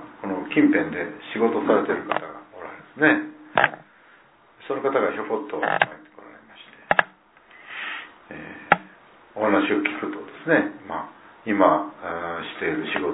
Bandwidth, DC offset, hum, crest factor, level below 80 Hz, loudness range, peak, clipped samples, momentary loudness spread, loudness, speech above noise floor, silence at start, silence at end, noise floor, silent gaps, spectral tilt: 4 kHz; under 0.1%; none; 24 dB; -64 dBFS; 4 LU; 0 dBFS; under 0.1%; 19 LU; -23 LUFS; 32 dB; 0 s; 0 s; -54 dBFS; none; -9 dB/octave